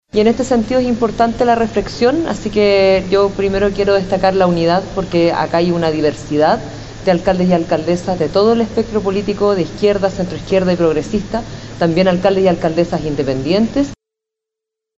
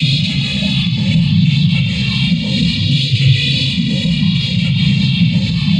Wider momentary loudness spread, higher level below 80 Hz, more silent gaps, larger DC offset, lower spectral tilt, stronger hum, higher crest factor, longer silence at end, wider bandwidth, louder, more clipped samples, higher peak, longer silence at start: first, 6 LU vs 3 LU; about the same, -36 dBFS vs -34 dBFS; neither; neither; about the same, -6.5 dB/octave vs -6 dB/octave; neither; about the same, 14 dB vs 12 dB; first, 1.05 s vs 0 s; second, 8.2 kHz vs 9.8 kHz; about the same, -15 LUFS vs -14 LUFS; neither; about the same, 0 dBFS vs 0 dBFS; first, 0.15 s vs 0 s